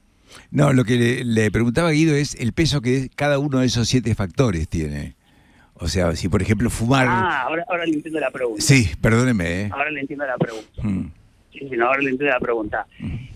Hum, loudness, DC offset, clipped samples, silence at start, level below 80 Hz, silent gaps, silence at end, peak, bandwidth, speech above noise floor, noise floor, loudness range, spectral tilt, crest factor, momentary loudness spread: none; -20 LUFS; under 0.1%; under 0.1%; 0.3 s; -36 dBFS; none; 0 s; -2 dBFS; 15.5 kHz; 33 dB; -53 dBFS; 4 LU; -5.5 dB/octave; 18 dB; 10 LU